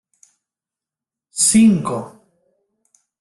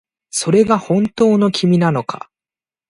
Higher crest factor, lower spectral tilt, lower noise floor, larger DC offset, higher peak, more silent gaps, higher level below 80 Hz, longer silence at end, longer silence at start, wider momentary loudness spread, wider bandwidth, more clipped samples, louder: about the same, 18 dB vs 16 dB; second, -4 dB/octave vs -6 dB/octave; about the same, -89 dBFS vs under -90 dBFS; neither; about the same, -2 dBFS vs 0 dBFS; neither; about the same, -58 dBFS vs -54 dBFS; first, 1.1 s vs 0.7 s; first, 1.35 s vs 0.35 s; first, 19 LU vs 10 LU; about the same, 12.5 kHz vs 11.5 kHz; neither; about the same, -15 LUFS vs -15 LUFS